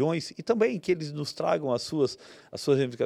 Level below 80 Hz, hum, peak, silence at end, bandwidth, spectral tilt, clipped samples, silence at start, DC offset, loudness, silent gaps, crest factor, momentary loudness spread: -68 dBFS; none; -12 dBFS; 0 s; 13.5 kHz; -6 dB/octave; under 0.1%; 0 s; under 0.1%; -28 LUFS; none; 16 dB; 8 LU